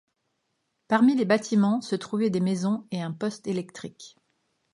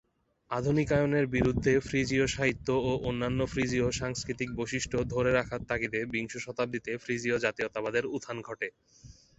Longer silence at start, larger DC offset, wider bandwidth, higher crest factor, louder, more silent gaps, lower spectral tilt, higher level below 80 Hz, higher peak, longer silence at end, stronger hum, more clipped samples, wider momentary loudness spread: first, 0.9 s vs 0.5 s; neither; first, 11.5 kHz vs 8.2 kHz; about the same, 20 dB vs 20 dB; first, -25 LUFS vs -30 LUFS; neither; about the same, -6.5 dB/octave vs -5.5 dB/octave; second, -74 dBFS vs -50 dBFS; about the same, -8 dBFS vs -10 dBFS; first, 0.65 s vs 0.25 s; neither; neither; first, 12 LU vs 9 LU